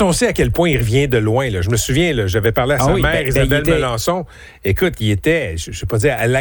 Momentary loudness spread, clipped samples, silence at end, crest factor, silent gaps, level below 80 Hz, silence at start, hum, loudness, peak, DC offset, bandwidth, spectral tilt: 6 LU; under 0.1%; 0 s; 12 dB; none; -30 dBFS; 0 s; none; -16 LUFS; -4 dBFS; under 0.1%; over 20 kHz; -5 dB/octave